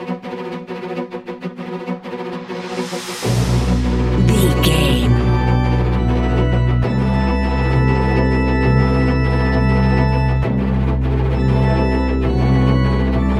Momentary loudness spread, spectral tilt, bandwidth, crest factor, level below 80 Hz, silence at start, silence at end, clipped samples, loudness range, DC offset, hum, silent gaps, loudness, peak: 12 LU; -7 dB/octave; 14 kHz; 14 dB; -22 dBFS; 0 s; 0 s; under 0.1%; 6 LU; under 0.1%; none; none; -17 LUFS; -2 dBFS